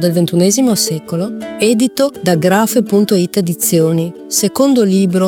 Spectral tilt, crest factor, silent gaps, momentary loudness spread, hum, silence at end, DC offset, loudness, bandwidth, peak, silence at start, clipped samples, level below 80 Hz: -5 dB/octave; 12 dB; none; 5 LU; none; 0 s; under 0.1%; -13 LUFS; 19.5 kHz; 0 dBFS; 0 s; under 0.1%; -56 dBFS